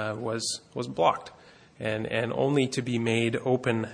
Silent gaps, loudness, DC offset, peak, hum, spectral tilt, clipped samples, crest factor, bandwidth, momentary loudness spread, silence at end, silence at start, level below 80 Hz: none; -28 LUFS; under 0.1%; -10 dBFS; none; -5 dB/octave; under 0.1%; 18 dB; 10.5 kHz; 9 LU; 0 s; 0 s; -64 dBFS